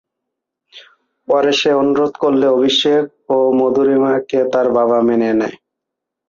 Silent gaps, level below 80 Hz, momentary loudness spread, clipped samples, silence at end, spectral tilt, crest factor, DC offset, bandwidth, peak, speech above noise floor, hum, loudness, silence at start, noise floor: none; -60 dBFS; 5 LU; under 0.1%; 0.75 s; -5 dB/octave; 12 dB; under 0.1%; 7.4 kHz; -4 dBFS; 67 dB; none; -14 LUFS; 0.75 s; -80 dBFS